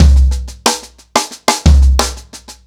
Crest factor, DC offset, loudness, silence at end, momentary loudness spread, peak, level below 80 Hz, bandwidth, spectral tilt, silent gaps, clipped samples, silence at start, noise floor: 12 dB; under 0.1%; -13 LUFS; 0.15 s; 12 LU; 0 dBFS; -12 dBFS; 15.5 kHz; -4.5 dB/octave; none; under 0.1%; 0 s; -34 dBFS